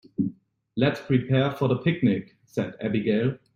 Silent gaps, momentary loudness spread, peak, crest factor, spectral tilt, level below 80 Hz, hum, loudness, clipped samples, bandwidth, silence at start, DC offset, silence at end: none; 8 LU; -6 dBFS; 18 dB; -8.5 dB/octave; -60 dBFS; none; -25 LUFS; under 0.1%; 7 kHz; 0.2 s; under 0.1%; 0.2 s